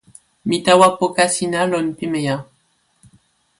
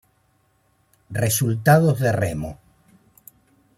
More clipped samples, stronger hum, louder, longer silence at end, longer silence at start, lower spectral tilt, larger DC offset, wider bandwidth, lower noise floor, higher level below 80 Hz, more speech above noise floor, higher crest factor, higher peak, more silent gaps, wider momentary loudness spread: neither; neither; first, -17 LUFS vs -20 LUFS; about the same, 1.15 s vs 1.25 s; second, 0.45 s vs 1.1 s; second, -4 dB/octave vs -5.5 dB/octave; neither; second, 11.5 kHz vs 16 kHz; about the same, -63 dBFS vs -64 dBFS; second, -58 dBFS vs -52 dBFS; about the same, 46 dB vs 45 dB; about the same, 18 dB vs 20 dB; about the same, 0 dBFS vs -2 dBFS; neither; second, 11 LU vs 15 LU